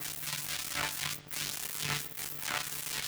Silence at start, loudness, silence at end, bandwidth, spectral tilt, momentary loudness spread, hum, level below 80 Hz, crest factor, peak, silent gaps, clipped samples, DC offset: 0 s; -34 LUFS; 0 s; over 20 kHz; -1 dB/octave; 2 LU; none; -62 dBFS; 20 dB; -18 dBFS; none; under 0.1%; under 0.1%